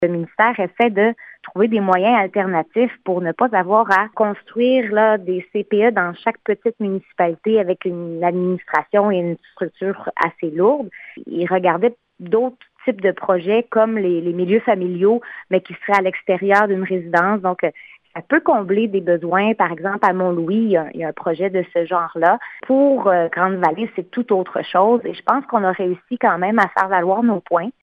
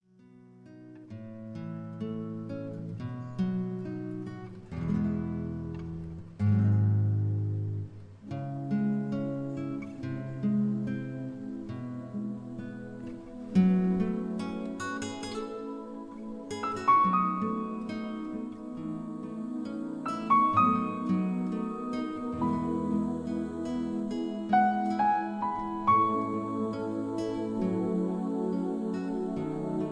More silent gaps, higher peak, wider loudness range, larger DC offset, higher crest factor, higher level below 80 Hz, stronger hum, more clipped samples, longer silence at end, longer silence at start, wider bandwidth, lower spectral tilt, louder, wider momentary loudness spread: neither; first, -2 dBFS vs -12 dBFS; second, 3 LU vs 6 LU; neither; about the same, 16 dB vs 18 dB; second, -68 dBFS vs -58 dBFS; neither; neither; about the same, 0.1 s vs 0 s; second, 0 s vs 0.35 s; second, 7.6 kHz vs 10 kHz; about the same, -8 dB/octave vs -8 dB/octave; first, -18 LUFS vs -31 LUFS; second, 8 LU vs 15 LU